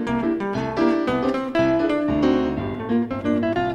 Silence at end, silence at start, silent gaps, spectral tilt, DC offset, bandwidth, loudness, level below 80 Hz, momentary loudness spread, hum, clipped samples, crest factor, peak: 0 s; 0 s; none; -7.5 dB/octave; under 0.1%; 8.8 kHz; -22 LUFS; -44 dBFS; 5 LU; none; under 0.1%; 16 dB; -6 dBFS